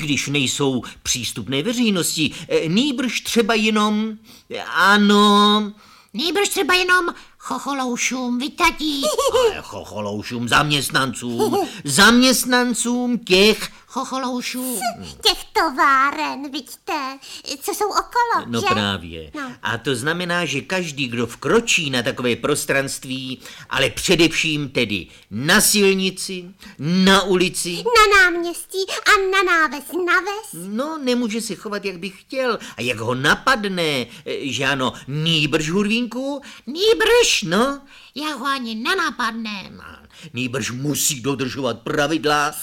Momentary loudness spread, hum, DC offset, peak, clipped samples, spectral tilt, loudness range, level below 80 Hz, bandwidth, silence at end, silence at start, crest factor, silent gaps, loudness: 14 LU; none; under 0.1%; 0 dBFS; under 0.1%; -3 dB/octave; 6 LU; -46 dBFS; 17 kHz; 0 s; 0 s; 18 dB; none; -19 LUFS